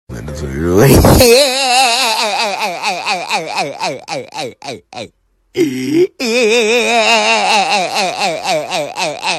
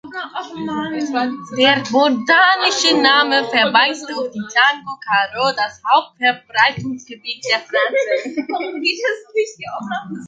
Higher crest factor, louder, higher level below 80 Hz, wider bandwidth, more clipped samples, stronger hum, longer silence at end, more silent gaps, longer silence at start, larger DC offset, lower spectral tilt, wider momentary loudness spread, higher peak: about the same, 14 dB vs 16 dB; first, -12 LUFS vs -16 LUFS; first, -30 dBFS vs -62 dBFS; first, 16.5 kHz vs 9.4 kHz; neither; neither; about the same, 0 s vs 0 s; neither; about the same, 0.1 s vs 0.05 s; neither; about the same, -3.5 dB/octave vs -2.5 dB/octave; first, 17 LU vs 14 LU; about the same, 0 dBFS vs -2 dBFS